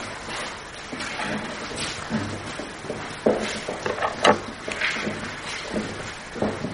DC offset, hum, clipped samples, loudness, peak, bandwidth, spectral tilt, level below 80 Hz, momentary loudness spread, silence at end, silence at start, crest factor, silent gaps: under 0.1%; none; under 0.1%; -27 LUFS; -2 dBFS; 10.5 kHz; -3.5 dB/octave; -50 dBFS; 12 LU; 0 s; 0 s; 24 dB; none